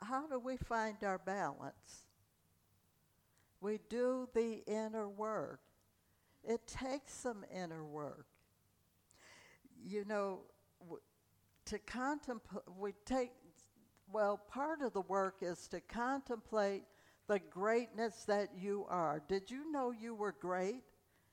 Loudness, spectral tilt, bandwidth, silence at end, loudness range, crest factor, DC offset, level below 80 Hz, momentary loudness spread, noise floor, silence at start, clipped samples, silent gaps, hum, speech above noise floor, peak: -42 LUFS; -5 dB/octave; 17.5 kHz; 0.5 s; 8 LU; 18 dB; under 0.1%; -68 dBFS; 14 LU; -76 dBFS; 0 s; under 0.1%; none; none; 35 dB; -24 dBFS